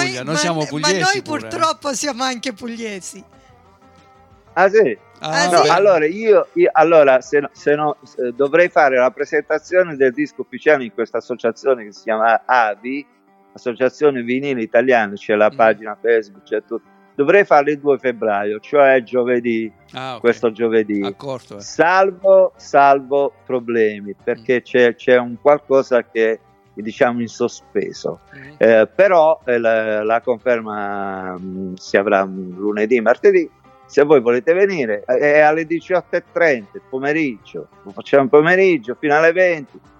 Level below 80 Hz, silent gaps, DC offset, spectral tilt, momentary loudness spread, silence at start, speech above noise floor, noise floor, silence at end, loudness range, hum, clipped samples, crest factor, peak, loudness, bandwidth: -66 dBFS; none; under 0.1%; -4.5 dB/octave; 14 LU; 0 s; 32 dB; -49 dBFS; 0.2 s; 5 LU; none; under 0.1%; 16 dB; 0 dBFS; -16 LUFS; 12 kHz